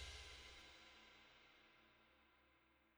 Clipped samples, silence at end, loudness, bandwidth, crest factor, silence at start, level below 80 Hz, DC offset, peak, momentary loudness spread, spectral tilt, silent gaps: under 0.1%; 0 s; -61 LUFS; over 20 kHz; 20 dB; 0 s; -70 dBFS; under 0.1%; -44 dBFS; 12 LU; -2 dB/octave; none